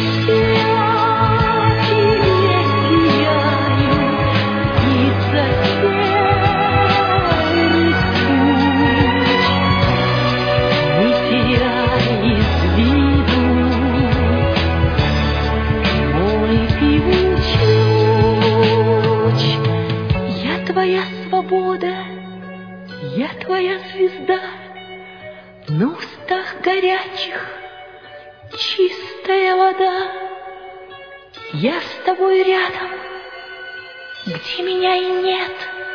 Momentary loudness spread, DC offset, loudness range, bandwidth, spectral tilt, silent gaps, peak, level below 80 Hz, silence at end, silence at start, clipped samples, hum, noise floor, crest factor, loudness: 17 LU; 0.2%; 8 LU; 5.4 kHz; -7.5 dB/octave; none; -2 dBFS; -30 dBFS; 0 s; 0 s; under 0.1%; none; -38 dBFS; 14 dB; -16 LUFS